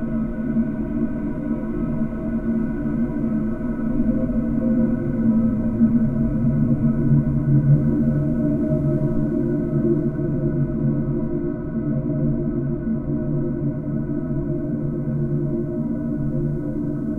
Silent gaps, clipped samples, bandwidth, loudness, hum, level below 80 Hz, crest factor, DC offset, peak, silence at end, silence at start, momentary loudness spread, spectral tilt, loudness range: none; under 0.1%; 2.6 kHz; -22 LUFS; none; -34 dBFS; 14 dB; under 0.1%; -6 dBFS; 0 s; 0 s; 6 LU; -12.5 dB/octave; 5 LU